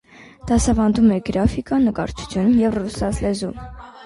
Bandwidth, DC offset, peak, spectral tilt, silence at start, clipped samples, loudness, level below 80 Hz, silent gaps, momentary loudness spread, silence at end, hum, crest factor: 11.5 kHz; under 0.1%; -4 dBFS; -6 dB/octave; 0.2 s; under 0.1%; -19 LUFS; -32 dBFS; none; 12 LU; 0 s; none; 16 dB